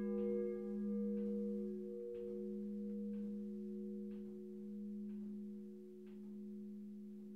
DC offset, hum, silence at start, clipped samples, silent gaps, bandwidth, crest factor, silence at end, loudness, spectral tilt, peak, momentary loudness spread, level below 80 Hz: under 0.1%; none; 0 s; under 0.1%; none; 3.4 kHz; 14 dB; 0 s; -46 LUFS; -10.5 dB/octave; -30 dBFS; 11 LU; -78 dBFS